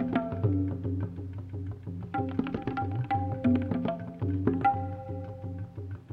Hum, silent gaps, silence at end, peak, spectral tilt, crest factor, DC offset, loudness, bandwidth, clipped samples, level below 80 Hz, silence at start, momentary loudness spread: none; none; 0 s; -12 dBFS; -10.5 dB/octave; 20 dB; under 0.1%; -32 LUFS; 4.7 kHz; under 0.1%; -54 dBFS; 0 s; 12 LU